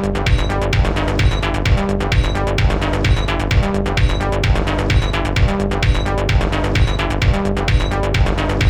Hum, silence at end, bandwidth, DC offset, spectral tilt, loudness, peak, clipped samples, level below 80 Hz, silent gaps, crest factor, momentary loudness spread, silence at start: none; 0 s; 11.5 kHz; 2%; -6 dB/octave; -17 LUFS; -4 dBFS; under 0.1%; -18 dBFS; none; 12 dB; 1 LU; 0 s